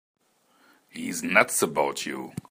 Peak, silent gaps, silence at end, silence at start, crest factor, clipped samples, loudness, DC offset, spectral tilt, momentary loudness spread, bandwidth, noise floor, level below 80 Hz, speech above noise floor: -2 dBFS; none; 0.1 s; 0.95 s; 26 dB; under 0.1%; -25 LUFS; under 0.1%; -2.5 dB/octave; 16 LU; 15.5 kHz; -64 dBFS; -72 dBFS; 38 dB